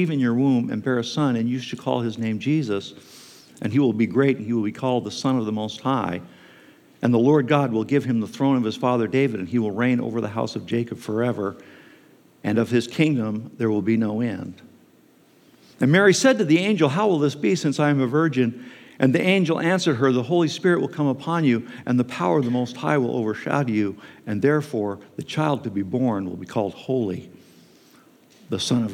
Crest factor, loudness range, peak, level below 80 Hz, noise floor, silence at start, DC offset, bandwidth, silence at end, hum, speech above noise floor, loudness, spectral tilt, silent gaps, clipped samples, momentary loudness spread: 20 dB; 5 LU; -4 dBFS; -74 dBFS; -55 dBFS; 0 s; under 0.1%; 14 kHz; 0 s; none; 34 dB; -22 LUFS; -6 dB/octave; none; under 0.1%; 9 LU